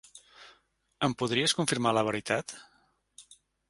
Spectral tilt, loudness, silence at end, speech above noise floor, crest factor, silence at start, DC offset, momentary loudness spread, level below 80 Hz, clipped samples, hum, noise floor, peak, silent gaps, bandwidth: -3.5 dB/octave; -28 LUFS; 0.35 s; 38 dB; 22 dB; 0.15 s; under 0.1%; 18 LU; -66 dBFS; under 0.1%; none; -67 dBFS; -10 dBFS; none; 12 kHz